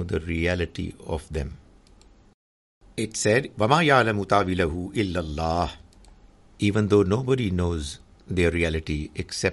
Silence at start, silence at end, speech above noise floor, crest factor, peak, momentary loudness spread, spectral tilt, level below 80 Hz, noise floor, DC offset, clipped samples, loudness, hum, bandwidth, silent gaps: 0 s; 0 s; 30 dB; 22 dB; -4 dBFS; 12 LU; -5.5 dB/octave; -42 dBFS; -53 dBFS; under 0.1%; under 0.1%; -24 LUFS; none; 11.5 kHz; 2.34-2.81 s